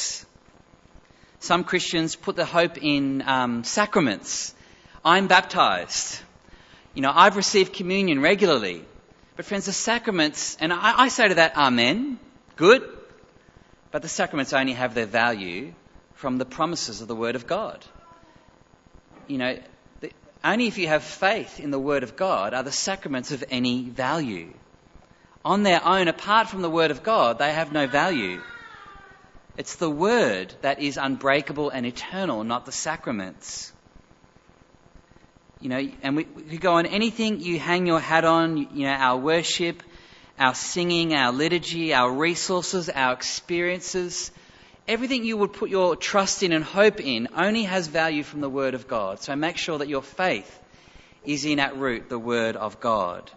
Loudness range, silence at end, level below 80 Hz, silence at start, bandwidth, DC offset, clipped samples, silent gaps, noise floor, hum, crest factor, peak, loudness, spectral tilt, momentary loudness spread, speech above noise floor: 8 LU; 0.05 s; -58 dBFS; 0 s; 8 kHz; under 0.1%; under 0.1%; none; -55 dBFS; none; 24 dB; -2 dBFS; -23 LUFS; -3.5 dB/octave; 13 LU; 32 dB